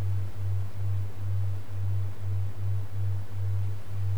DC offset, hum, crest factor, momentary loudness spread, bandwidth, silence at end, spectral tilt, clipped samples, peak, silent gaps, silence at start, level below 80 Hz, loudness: 4%; none; 8 dB; 2 LU; 5.4 kHz; 0 s; -7.5 dB/octave; under 0.1%; -20 dBFS; none; 0 s; -54 dBFS; -33 LUFS